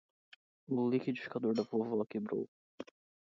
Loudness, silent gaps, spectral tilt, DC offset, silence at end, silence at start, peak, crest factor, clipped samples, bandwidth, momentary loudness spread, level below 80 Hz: -36 LUFS; 2.48-2.78 s; -6.5 dB/octave; under 0.1%; 0.4 s; 0.7 s; -20 dBFS; 18 dB; under 0.1%; 7.2 kHz; 19 LU; -82 dBFS